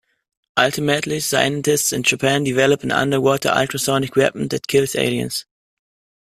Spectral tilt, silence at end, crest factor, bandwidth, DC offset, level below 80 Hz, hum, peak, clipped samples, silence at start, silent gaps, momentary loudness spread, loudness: -3.5 dB/octave; 0.95 s; 18 dB; 15.5 kHz; under 0.1%; -54 dBFS; none; -2 dBFS; under 0.1%; 0.55 s; none; 4 LU; -18 LUFS